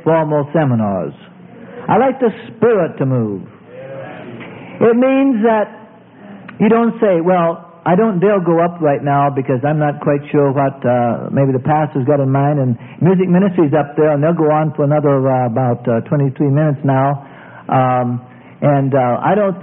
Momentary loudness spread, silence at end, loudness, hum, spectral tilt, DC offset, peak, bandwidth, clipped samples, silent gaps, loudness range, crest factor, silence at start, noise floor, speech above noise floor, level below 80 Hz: 13 LU; 0 s; -14 LUFS; none; -14 dB/octave; under 0.1%; 0 dBFS; 3.7 kHz; under 0.1%; none; 3 LU; 14 dB; 0.05 s; -39 dBFS; 25 dB; -56 dBFS